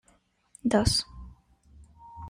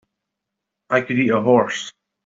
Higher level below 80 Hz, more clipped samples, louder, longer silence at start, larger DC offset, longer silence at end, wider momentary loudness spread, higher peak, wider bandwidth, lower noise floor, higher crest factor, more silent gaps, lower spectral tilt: first, -44 dBFS vs -66 dBFS; neither; second, -26 LUFS vs -19 LUFS; second, 0.65 s vs 0.9 s; neither; second, 0 s vs 0.35 s; first, 26 LU vs 12 LU; second, -8 dBFS vs -4 dBFS; first, 16 kHz vs 7.8 kHz; second, -66 dBFS vs -81 dBFS; first, 24 dB vs 18 dB; neither; about the same, -4.5 dB/octave vs -5.5 dB/octave